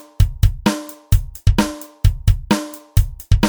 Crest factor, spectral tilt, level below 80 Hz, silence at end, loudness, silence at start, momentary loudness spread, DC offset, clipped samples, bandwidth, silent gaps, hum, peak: 16 dB; -6 dB/octave; -20 dBFS; 0 s; -20 LUFS; 0.2 s; 3 LU; under 0.1%; under 0.1%; over 20 kHz; none; none; 0 dBFS